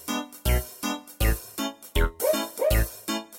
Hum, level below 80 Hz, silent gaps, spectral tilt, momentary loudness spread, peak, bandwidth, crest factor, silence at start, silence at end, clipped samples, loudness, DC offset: none; -30 dBFS; none; -4.5 dB/octave; 7 LU; -10 dBFS; 17 kHz; 16 dB; 0 s; 0 s; under 0.1%; -27 LUFS; under 0.1%